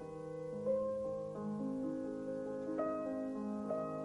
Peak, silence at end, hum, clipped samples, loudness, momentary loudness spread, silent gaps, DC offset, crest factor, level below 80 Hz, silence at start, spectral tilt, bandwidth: -26 dBFS; 0 s; none; under 0.1%; -40 LUFS; 5 LU; none; under 0.1%; 14 dB; -70 dBFS; 0 s; -8.5 dB/octave; 11.5 kHz